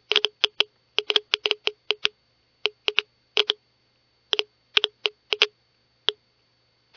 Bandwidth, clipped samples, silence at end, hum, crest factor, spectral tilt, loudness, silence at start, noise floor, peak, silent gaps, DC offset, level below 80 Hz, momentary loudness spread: 5.4 kHz; under 0.1%; 0.85 s; none; 26 dB; 1 dB/octave; -24 LUFS; 0.1 s; -66 dBFS; -2 dBFS; none; under 0.1%; -78 dBFS; 6 LU